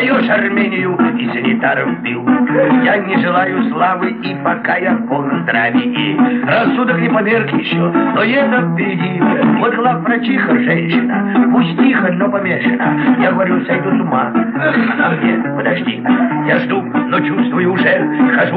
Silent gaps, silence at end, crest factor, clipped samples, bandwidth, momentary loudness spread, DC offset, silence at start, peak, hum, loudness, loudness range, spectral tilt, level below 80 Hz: none; 0 s; 12 dB; under 0.1%; 4.7 kHz; 4 LU; 0.1%; 0 s; 0 dBFS; none; -13 LUFS; 1 LU; -10.5 dB/octave; -68 dBFS